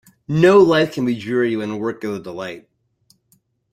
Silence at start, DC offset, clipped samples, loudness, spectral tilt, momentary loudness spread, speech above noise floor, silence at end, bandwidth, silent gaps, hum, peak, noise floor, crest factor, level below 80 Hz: 0.3 s; under 0.1%; under 0.1%; -17 LUFS; -7 dB/octave; 18 LU; 45 dB; 1.15 s; 14 kHz; none; none; -2 dBFS; -62 dBFS; 16 dB; -56 dBFS